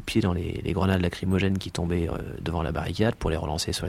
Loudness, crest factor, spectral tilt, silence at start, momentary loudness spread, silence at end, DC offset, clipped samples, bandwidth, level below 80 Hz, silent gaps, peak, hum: -27 LUFS; 20 dB; -6 dB/octave; 0 s; 5 LU; 0 s; under 0.1%; under 0.1%; 15.5 kHz; -40 dBFS; none; -8 dBFS; none